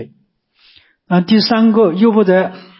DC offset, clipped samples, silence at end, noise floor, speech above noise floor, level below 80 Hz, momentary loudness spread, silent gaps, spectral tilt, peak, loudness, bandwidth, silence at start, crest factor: under 0.1%; under 0.1%; 0.2 s; -58 dBFS; 46 dB; -62 dBFS; 5 LU; none; -10.5 dB/octave; -2 dBFS; -12 LUFS; 5.8 kHz; 0 s; 12 dB